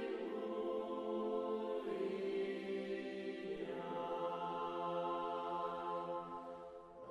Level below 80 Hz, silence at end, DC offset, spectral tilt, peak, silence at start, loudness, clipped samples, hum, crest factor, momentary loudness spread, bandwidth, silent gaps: -78 dBFS; 0 s; under 0.1%; -6.5 dB/octave; -30 dBFS; 0 s; -43 LUFS; under 0.1%; none; 12 dB; 5 LU; 11 kHz; none